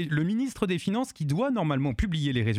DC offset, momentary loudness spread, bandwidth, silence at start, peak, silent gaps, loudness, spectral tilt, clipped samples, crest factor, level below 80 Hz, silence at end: under 0.1%; 3 LU; 14.5 kHz; 0 s; -10 dBFS; none; -28 LUFS; -6.5 dB/octave; under 0.1%; 18 dB; -42 dBFS; 0 s